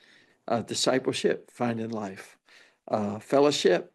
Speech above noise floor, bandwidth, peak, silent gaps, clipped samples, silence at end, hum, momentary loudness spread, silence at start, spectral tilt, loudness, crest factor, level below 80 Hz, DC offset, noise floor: 32 dB; 12.5 kHz; -10 dBFS; none; under 0.1%; 0.1 s; none; 13 LU; 0.45 s; -4 dB/octave; -27 LUFS; 18 dB; -80 dBFS; under 0.1%; -59 dBFS